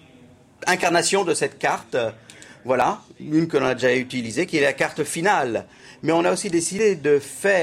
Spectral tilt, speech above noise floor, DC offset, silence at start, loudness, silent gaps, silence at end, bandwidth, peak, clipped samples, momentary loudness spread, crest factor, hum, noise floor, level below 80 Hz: -4 dB/octave; 29 dB; under 0.1%; 0.6 s; -21 LUFS; none; 0 s; 16 kHz; -6 dBFS; under 0.1%; 8 LU; 16 dB; none; -50 dBFS; -60 dBFS